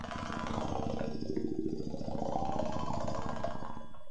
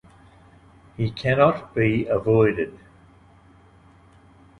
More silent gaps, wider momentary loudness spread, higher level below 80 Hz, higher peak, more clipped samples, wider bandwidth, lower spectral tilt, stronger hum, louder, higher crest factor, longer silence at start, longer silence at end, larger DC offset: neither; second, 4 LU vs 10 LU; about the same, -50 dBFS vs -50 dBFS; second, -18 dBFS vs -4 dBFS; neither; about the same, 10.5 kHz vs 9.8 kHz; second, -6.5 dB/octave vs -8.5 dB/octave; neither; second, -38 LUFS vs -22 LUFS; about the same, 18 dB vs 20 dB; second, 0 s vs 1 s; second, 0 s vs 1.85 s; first, 1% vs under 0.1%